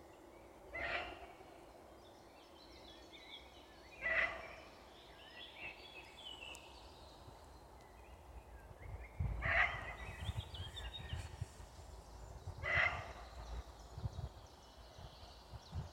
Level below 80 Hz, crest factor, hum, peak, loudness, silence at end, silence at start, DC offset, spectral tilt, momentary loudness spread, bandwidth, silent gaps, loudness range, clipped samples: -56 dBFS; 26 dB; none; -20 dBFS; -43 LUFS; 0 s; 0 s; under 0.1%; -4.5 dB/octave; 23 LU; 16.5 kHz; none; 11 LU; under 0.1%